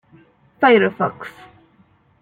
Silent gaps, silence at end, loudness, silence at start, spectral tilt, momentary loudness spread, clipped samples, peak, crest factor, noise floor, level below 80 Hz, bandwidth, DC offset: none; 0.9 s; -16 LUFS; 0.6 s; -7.5 dB/octave; 22 LU; under 0.1%; -2 dBFS; 20 dB; -56 dBFS; -64 dBFS; 4.8 kHz; under 0.1%